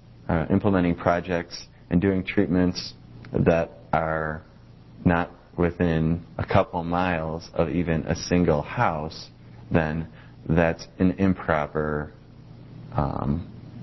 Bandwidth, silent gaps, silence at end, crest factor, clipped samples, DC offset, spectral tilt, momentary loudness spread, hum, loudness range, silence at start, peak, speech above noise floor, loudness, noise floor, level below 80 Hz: 6.2 kHz; none; 0 s; 22 dB; under 0.1%; under 0.1%; -7.5 dB/octave; 14 LU; none; 2 LU; 0.1 s; -4 dBFS; 24 dB; -25 LUFS; -48 dBFS; -40 dBFS